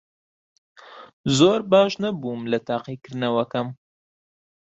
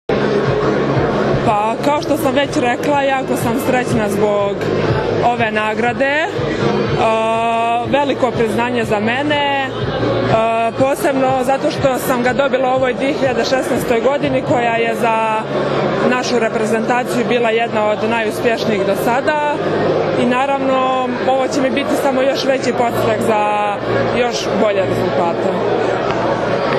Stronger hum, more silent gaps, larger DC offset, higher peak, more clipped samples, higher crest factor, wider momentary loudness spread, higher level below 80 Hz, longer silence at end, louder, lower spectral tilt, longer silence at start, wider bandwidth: neither; first, 1.13-1.24 s vs none; neither; second, -4 dBFS vs 0 dBFS; neither; first, 20 dB vs 14 dB; first, 12 LU vs 2 LU; second, -62 dBFS vs -42 dBFS; first, 0.95 s vs 0 s; second, -22 LUFS vs -16 LUFS; about the same, -5.5 dB/octave vs -5.5 dB/octave; first, 0.85 s vs 0.1 s; second, 8.2 kHz vs 13.5 kHz